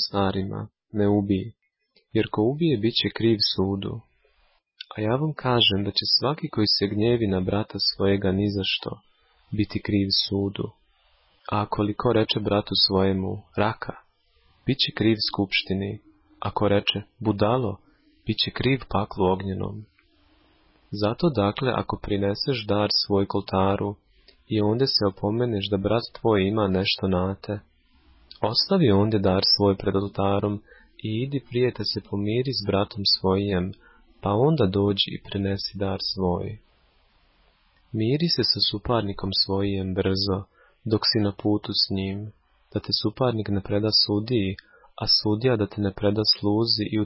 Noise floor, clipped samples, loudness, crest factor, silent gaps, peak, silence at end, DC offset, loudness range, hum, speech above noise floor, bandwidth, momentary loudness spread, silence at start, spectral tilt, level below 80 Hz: -67 dBFS; under 0.1%; -24 LUFS; 16 dB; none; -8 dBFS; 0 s; under 0.1%; 4 LU; none; 43 dB; 5.8 kHz; 12 LU; 0 s; -9 dB/octave; -46 dBFS